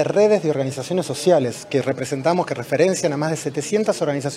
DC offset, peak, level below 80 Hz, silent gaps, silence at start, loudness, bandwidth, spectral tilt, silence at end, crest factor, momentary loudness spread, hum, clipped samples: under 0.1%; -4 dBFS; -64 dBFS; none; 0 s; -20 LUFS; 15 kHz; -5 dB/octave; 0 s; 16 dB; 7 LU; none; under 0.1%